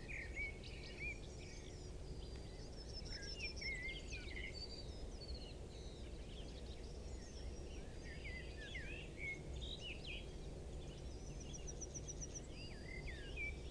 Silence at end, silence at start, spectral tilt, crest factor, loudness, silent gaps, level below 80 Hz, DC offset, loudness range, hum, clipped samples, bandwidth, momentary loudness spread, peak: 0 s; 0 s; -3.5 dB/octave; 16 dB; -50 LUFS; none; -52 dBFS; under 0.1%; 4 LU; none; under 0.1%; 10.5 kHz; 7 LU; -34 dBFS